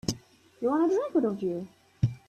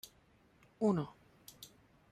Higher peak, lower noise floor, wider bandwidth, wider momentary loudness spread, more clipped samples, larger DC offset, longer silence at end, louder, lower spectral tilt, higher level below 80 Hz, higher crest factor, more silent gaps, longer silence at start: first, -10 dBFS vs -22 dBFS; second, -51 dBFS vs -68 dBFS; second, 13.5 kHz vs 15 kHz; second, 14 LU vs 23 LU; neither; neither; second, 0.1 s vs 0.45 s; first, -29 LUFS vs -36 LUFS; about the same, -7 dB/octave vs -7 dB/octave; first, -56 dBFS vs -72 dBFS; about the same, 20 dB vs 20 dB; neither; about the same, 0.05 s vs 0.05 s